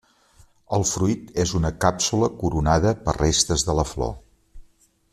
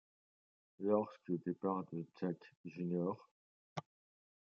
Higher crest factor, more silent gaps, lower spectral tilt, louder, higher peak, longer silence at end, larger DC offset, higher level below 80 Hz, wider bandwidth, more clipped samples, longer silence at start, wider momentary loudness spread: about the same, 20 dB vs 20 dB; second, none vs 2.56-2.64 s, 3.31-3.76 s; second, -4.5 dB/octave vs -9 dB/octave; first, -22 LUFS vs -42 LUFS; first, -2 dBFS vs -22 dBFS; second, 0.5 s vs 0.7 s; neither; first, -36 dBFS vs -90 dBFS; first, 14 kHz vs 6.8 kHz; neither; about the same, 0.7 s vs 0.8 s; second, 7 LU vs 14 LU